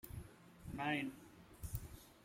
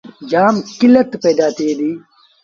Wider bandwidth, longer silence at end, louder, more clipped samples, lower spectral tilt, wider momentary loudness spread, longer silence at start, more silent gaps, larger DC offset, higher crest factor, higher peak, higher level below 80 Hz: first, 16 kHz vs 7.4 kHz; second, 0 s vs 0.45 s; second, -45 LUFS vs -14 LUFS; neither; about the same, -5 dB/octave vs -5.5 dB/octave; first, 19 LU vs 10 LU; second, 0.05 s vs 0.2 s; neither; neither; first, 22 dB vs 14 dB; second, -26 dBFS vs 0 dBFS; about the same, -58 dBFS vs -58 dBFS